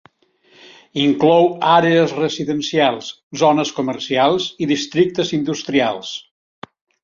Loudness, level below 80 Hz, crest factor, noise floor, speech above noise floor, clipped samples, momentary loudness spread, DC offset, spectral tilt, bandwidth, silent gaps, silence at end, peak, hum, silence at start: -17 LUFS; -60 dBFS; 16 dB; -56 dBFS; 39 dB; under 0.1%; 12 LU; under 0.1%; -5 dB/octave; 7.6 kHz; 3.23-3.31 s; 0.85 s; -2 dBFS; none; 0.95 s